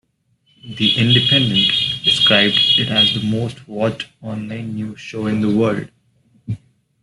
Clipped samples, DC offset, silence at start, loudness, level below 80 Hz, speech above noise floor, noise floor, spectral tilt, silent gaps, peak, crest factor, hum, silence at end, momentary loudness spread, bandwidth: under 0.1%; under 0.1%; 0.65 s; -15 LUFS; -52 dBFS; 45 dB; -62 dBFS; -5 dB/octave; none; 0 dBFS; 18 dB; none; 0.45 s; 17 LU; 12 kHz